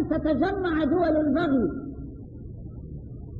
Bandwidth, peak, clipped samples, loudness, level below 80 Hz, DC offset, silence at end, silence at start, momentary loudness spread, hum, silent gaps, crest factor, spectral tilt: 5.2 kHz; -12 dBFS; under 0.1%; -24 LUFS; -42 dBFS; 0.1%; 0 s; 0 s; 18 LU; none; none; 14 dB; -9.5 dB/octave